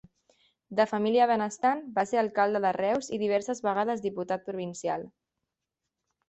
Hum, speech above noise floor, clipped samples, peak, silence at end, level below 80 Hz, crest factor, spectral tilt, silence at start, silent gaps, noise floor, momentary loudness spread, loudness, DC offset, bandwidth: none; 59 dB; under 0.1%; -12 dBFS; 1.2 s; -72 dBFS; 18 dB; -5 dB/octave; 0.7 s; none; -86 dBFS; 9 LU; -28 LUFS; under 0.1%; 8.4 kHz